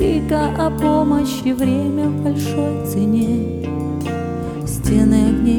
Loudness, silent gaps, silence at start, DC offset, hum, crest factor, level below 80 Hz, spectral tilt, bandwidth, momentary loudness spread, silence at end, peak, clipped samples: -18 LUFS; none; 0 s; under 0.1%; none; 14 dB; -32 dBFS; -7 dB/octave; 19.5 kHz; 9 LU; 0 s; -2 dBFS; under 0.1%